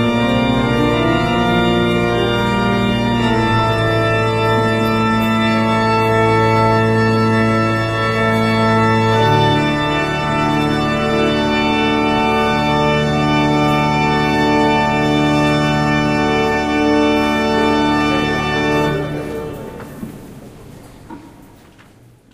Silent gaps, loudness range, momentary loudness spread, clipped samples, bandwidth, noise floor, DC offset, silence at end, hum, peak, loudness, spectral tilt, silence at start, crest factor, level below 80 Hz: none; 4 LU; 3 LU; under 0.1%; 15.5 kHz; -46 dBFS; under 0.1%; 1.05 s; none; 0 dBFS; -15 LUFS; -6 dB/octave; 0 s; 14 dB; -34 dBFS